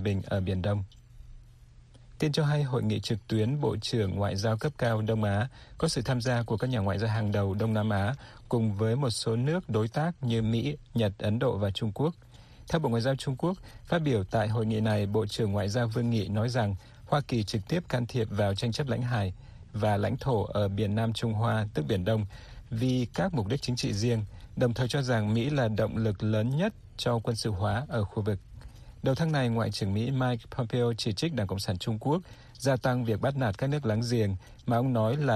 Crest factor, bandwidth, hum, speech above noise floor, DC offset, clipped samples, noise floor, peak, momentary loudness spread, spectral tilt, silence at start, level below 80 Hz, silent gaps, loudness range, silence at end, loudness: 16 dB; 13 kHz; none; 25 dB; under 0.1%; under 0.1%; -53 dBFS; -12 dBFS; 5 LU; -6.5 dB/octave; 0 s; -52 dBFS; none; 2 LU; 0 s; -29 LUFS